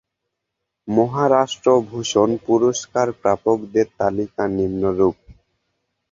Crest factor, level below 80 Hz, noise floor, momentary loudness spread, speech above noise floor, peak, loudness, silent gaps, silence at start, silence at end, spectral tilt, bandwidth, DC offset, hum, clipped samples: 18 dB; -50 dBFS; -79 dBFS; 5 LU; 61 dB; -2 dBFS; -19 LUFS; none; 0.85 s; 0.8 s; -5.5 dB/octave; 7.8 kHz; under 0.1%; none; under 0.1%